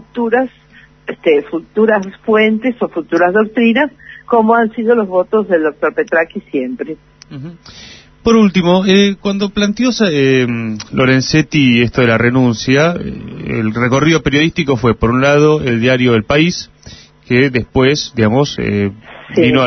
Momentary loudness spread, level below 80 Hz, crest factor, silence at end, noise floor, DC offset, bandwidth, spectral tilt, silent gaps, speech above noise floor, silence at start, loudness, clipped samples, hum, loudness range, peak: 10 LU; -40 dBFS; 12 dB; 0 s; -38 dBFS; under 0.1%; 6.4 kHz; -6 dB/octave; none; 25 dB; 0.15 s; -13 LUFS; under 0.1%; none; 3 LU; 0 dBFS